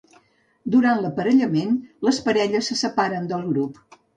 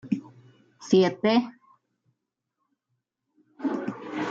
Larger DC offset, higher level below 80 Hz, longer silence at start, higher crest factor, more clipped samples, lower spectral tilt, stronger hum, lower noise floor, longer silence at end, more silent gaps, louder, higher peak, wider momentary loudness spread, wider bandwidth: neither; first, -64 dBFS vs -72 dBFS; first, 0.65 s vs 0.05 s; second, 14 dB vs 20 dB; neither; about the same, -5 dB/octave vs -6 dB/octave; neither; second, -59 dBFS vs -82 dBFS; first, 0.45 s vs 0 s; neither; first, -21 LUFS vs -26 LUFS; about the same, -8 dBFS vs -8 dBFS; second, 7 LU vs 13 LU; first, 9.6 kHz vs 7.6 kHz